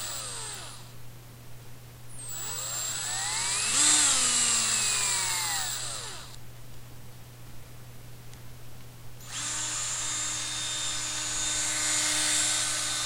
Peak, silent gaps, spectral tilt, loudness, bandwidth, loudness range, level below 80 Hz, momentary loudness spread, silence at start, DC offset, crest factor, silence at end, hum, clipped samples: -10 dBFS; none; 0.5 dB/octave; -26 LUFS; 16 kHz; 15 LU; -54 dBFS; 26 LU; 0 s; under 0.1%; 22 dB; 0 s; none; under 0.1%